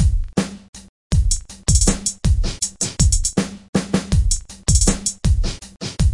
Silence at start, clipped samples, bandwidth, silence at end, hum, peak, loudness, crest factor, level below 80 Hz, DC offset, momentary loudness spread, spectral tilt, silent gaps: 0 s; under 0.1%; 11.5 kHz; 0 s; none; 0 dBFS; -20 LUFS; 18 dB; -22 dBFS; under 0.1%; 8 LU; -4 dB/octave; 0.69-0.73 s, 0.89-1.10 s, 3.69-3.73 s